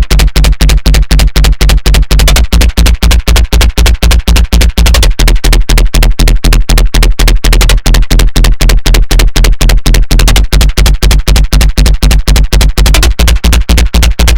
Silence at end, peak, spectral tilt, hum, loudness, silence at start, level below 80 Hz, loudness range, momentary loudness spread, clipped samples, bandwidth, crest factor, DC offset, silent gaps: 0 s; 0 dBFS; -4 dB/octave; none; -8 LUFS; 0 s; -6 dBFS; 1 LU; 2 LU; 10%; 17.5 kHz; 6 dB; 10%; none